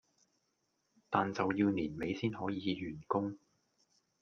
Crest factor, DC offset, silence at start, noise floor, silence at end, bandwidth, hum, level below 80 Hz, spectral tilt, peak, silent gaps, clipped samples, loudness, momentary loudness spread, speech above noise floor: 24 dB; under 0.1%; 1.1 s; -81 dBFS; 0.85 s; 6.8 kHz; none; -70 dBFS; -7 dB/octave; -14 dBFS; none; under 0.1%; -36 LUFS; 8 LU; 46 dB